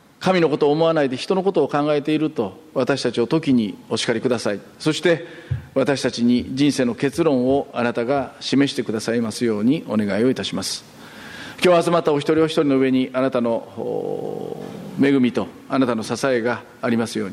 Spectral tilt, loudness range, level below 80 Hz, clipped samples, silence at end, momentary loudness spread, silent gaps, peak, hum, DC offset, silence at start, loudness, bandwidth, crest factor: -5.5 dB/octave; 2 LU; -56 dBFS; under 0.1%; 0 s; 10 LU; none; -4 dBFS; none; under 0.1%; 0.2 s; -20 LUFS; 13.5 kHz; 16 dB